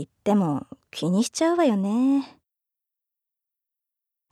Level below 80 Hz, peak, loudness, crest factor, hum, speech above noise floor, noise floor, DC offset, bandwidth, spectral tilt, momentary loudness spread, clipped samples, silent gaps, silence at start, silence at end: -72 dBFS; -10 dBFS; -23 LUFS; 16 dB; none; 62 dB; -84 dBFS; under 0.1%; 13.5 kHz; -6 dB/octave; 10 LU; under 0.1%; none; 0 s; 2.05 s